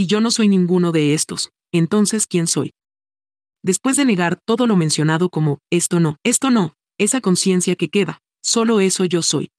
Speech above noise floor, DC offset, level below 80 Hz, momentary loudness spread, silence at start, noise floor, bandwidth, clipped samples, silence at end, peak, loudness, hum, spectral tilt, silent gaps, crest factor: over 73 dB; under 0.1%; -70 dBFS; 6 LU; 0 s; under -90 dBFS; 12.5 kHz; under 0.1%; 0.15 s; -4 dBFS; -17 LUFS; none; -4.5 dB/octave; none; 14 dB